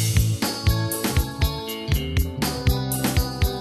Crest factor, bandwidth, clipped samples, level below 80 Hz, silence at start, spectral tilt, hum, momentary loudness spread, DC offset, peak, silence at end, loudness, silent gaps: 16 dB; 14 kHz; under 0.1%; -28 dBFS; 0 s; -4.5 dB/octave; none; 3 LU; under 0.1%; -8 dBFS; 0 s; -24 LUFS; none